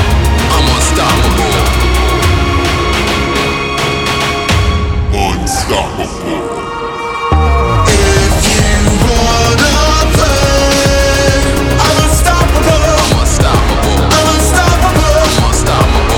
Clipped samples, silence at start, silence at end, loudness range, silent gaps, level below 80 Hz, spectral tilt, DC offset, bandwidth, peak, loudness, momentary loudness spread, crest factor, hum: under 0.1%; 0 s; 0 s; 4 LU; none; -14 dBFS; -4 dB/octave; under 0.1%; 18 kHz; 0 dBFS; -10 LUFS; 5 LU; 10 dB; none